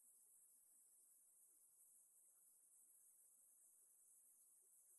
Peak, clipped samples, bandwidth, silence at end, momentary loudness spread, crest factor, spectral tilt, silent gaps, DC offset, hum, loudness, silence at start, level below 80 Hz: -60 dBFS; under 0.1%; 12 kHz; 0 s; 1 LU; 14 dB; 1 dB/octave; none; under 0.1%; none; -70 LUFS; 0 s; under -90 dBFS